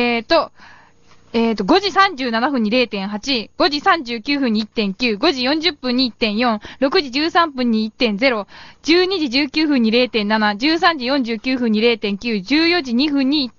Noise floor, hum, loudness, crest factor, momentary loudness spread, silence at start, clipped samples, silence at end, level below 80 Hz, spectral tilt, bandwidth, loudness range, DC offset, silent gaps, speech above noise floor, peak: -51 dBFS; none; -17 LUFS; 18 dB; 6 LU; 0 s; under 0.1%; 0.1 s; -50 dBFS; -2 dB/octave; 7.4 kHz; 2 LU; under 0.1%; none; 33 dB; 0 dBFS